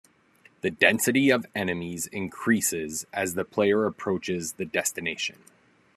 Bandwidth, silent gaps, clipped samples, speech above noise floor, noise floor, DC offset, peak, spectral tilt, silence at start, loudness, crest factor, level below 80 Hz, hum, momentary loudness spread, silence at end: 13.5 kHz; none; under 0.1%; 33 dB; -60 dBFS; under 0.1%; -2 dBFS; -3.5 dB/octave; 0.65 s; -26 LUFS; 24 dB; -68 dBFS; none; 11 LU; 0.65 s